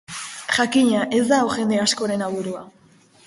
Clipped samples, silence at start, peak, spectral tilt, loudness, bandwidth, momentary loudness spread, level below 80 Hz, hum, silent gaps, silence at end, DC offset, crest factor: under 0.1%; 0.1 s; -4 dBFS; -3.5 dB/octave; -20 LUFS; 11.5 kHz; 13 LU; -60 dBFS; none; none; 0.6 s; under 0.1%; 16 dB